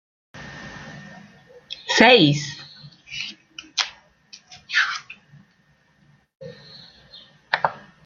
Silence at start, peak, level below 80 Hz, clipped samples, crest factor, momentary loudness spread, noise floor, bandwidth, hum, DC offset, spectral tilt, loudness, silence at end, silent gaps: 0.35 s; -2 dBFS; -62 dBFS; under 0.1%; 24 dB; 29 LU; -61 dBFS; 7.8 kHz; none; under 0.1%; -4 dB/octave; -20 LUFS; 0.25 s; none